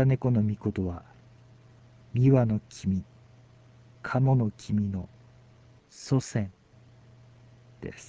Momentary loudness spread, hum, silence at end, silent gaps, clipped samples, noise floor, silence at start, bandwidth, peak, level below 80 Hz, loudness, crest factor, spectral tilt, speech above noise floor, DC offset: 19 LU; none; 0.05 s; none; under 0.1%; -56 dBFS; 0 s; 8 kHz; -10 dBFS; -52 dBFS; -28 LUFS; 20 dB; -8 dB/octave; 30 dB; under 0.1%